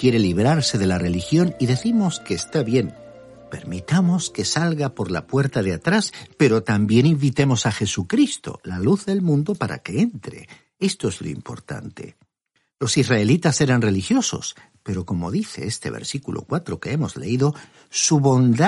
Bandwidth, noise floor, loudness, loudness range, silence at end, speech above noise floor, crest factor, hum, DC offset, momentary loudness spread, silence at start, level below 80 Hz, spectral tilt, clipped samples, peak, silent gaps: 11.5 kHz; -70 dBFS; -21 LUFS; 6 LU; 0 s; 50 dB; 18 dB; none; under 0.1%; 14 LU; 0 s; -52 dBFS; -5.5 dB/octave; under 0.1%; -4 dBFS; none